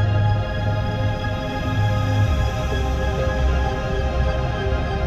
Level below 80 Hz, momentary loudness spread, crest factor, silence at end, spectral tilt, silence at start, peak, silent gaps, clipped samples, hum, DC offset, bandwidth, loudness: -26 dBFS; 4 LU; 12 dB; 0 s; -7 dB/octave; 0 s; -8 dBFS; none; under 0.1%; none; 0.2%; 8 kHz; -22 LUFS